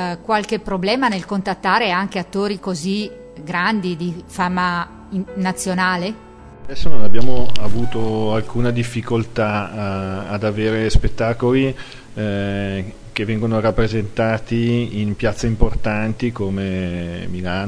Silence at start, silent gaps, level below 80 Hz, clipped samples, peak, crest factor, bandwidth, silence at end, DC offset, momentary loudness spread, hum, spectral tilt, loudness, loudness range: 0 s; none; -30 dBFS; under 0.1%; 0 dBFS; 14 dB; 11 kHz; 0 s; under 0.1%; 9 LU; none; -6 dB/octave; -21 LUFS; 3 LU